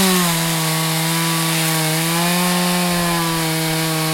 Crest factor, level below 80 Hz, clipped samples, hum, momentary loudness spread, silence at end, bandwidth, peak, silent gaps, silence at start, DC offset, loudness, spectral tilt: 14 dB; -46 dBFS; under 0.1%; none; 2 LU; 0 s; 16.5 kHz; -4 dBFS; none; 0 s; under 0.1%; -17 LUFS; -3.5 dB/octave